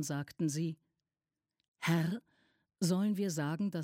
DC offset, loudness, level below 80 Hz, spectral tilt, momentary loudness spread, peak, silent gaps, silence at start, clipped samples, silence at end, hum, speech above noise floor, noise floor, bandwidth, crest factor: under 0.1%; -35 LUFS; -78 dBFS; -5.5 dB/octave; 8 LU; -20 dBFS; 1.68-1.74 s; 0 s; under 0.1%; 0 s; none; over 56 dB; under -90 dBFS; 16 kHz; 16 dB